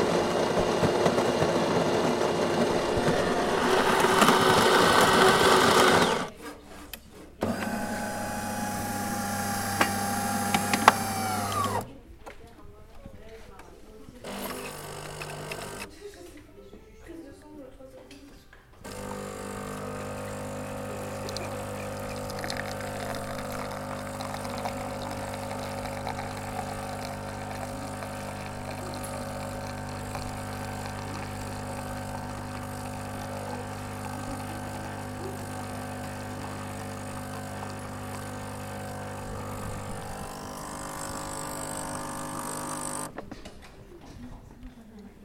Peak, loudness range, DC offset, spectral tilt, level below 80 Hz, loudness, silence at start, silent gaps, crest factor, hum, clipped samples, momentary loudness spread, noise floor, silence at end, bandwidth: 0 dBFS; 17 LU; under 0.1%; -4 dB/octave; -50 dBFS; -29 LUFS; 0 s; none; 30 dB; none; under 0.1%; 25 LU; -51 dBFS; 0 s; 16.5 kHz